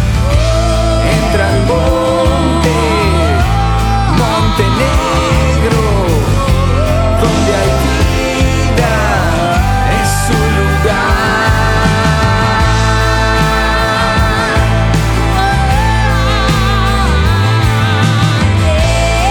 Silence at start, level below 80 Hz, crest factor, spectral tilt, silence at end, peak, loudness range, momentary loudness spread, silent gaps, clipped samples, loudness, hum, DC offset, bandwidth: 0 s; -16 dBFS; 10 dB; -5.5 dB/octave; 0 s; 0 dBFS; 1 LU; 1 LU; none; under 0.1%; -11 LUFS; none; under 0.1%; 19 kHz